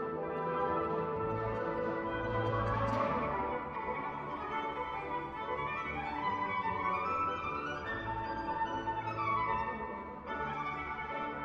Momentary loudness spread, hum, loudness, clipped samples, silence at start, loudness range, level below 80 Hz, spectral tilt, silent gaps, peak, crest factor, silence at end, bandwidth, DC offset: 6 LU; none; -36 LUFS; under 0.1%; 0 s; 2 LU; -54 dBFS; -7 dB/octave; none; -20 dBFS; 16 dB; 0 s; 8 kHz; under 0.1%